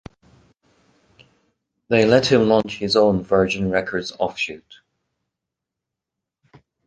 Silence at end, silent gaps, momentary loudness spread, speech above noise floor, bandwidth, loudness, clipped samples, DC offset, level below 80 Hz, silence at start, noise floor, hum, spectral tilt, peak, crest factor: 2.3 s; none; 11 LU; 66 dB; 9.4 kHz; -19 LUFS; under 0.1%; under 0.1%; -52 dBFS; 1.9 s; -84 dBFS; none; -5.5 dB/octave; -2 dBFS; 20 dB